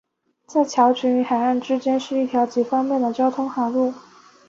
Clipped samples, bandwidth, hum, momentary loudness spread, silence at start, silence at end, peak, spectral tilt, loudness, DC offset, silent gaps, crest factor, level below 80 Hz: under 0.1%; 7.6 kHz; none; 6 LU; 0.5 s; 0.5 s; -6 dBFS; -4.5 dB/octave; -21 LUFS; under 0.1%; none; 16 dB; -70 dBFS